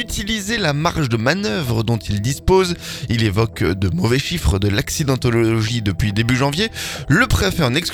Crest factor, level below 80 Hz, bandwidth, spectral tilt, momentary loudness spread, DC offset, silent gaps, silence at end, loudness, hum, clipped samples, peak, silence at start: 16 dB; -32 dBFS; 19 kHz; -5 dB/octave; 5 LU; under 0.1%; none; 0 s; -18 LUFS; none; under 0.1%; 0 dBFS; 0 s